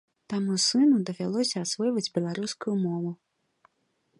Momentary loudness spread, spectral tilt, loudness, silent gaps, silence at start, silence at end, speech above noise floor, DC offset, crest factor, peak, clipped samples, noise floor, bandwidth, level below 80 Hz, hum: 11 LU; -4.5 dB/octave; -27 LUFS; none; 0.3 s; 1.05 s; 47 dB; under 0.1%; 14 dB; -14 dBFS; under 0.1%; -74 dBFS; 11.5 kHz; -76 dBFS; none